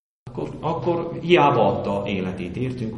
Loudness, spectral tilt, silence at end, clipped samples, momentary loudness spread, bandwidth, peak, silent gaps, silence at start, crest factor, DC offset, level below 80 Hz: -22 LUFS; -7.5 dB/octave; 0 s; under 0.1%; 14 LU; 8.4 kHz; -2 dBFS; none; 0.25 s; 20 dB; under 0.1%; -50 dBFS